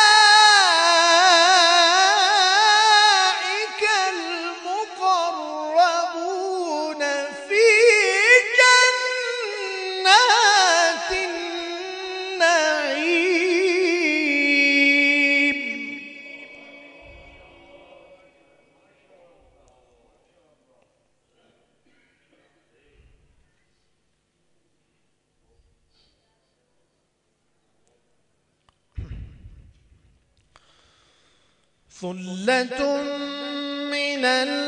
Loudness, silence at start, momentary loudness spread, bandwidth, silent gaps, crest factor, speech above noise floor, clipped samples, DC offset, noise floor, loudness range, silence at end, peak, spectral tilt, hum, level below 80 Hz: -17 LUFS; 0 s; 16 LU; 11 kHz; none; 20 dB; 47 dB; under 0.1%; under 0.1%; -70 dBFS; 13 LU; 0 s; 0 dBFS; -1 dB/octave; 50 Hz at -70 dBFS; -56 dBFS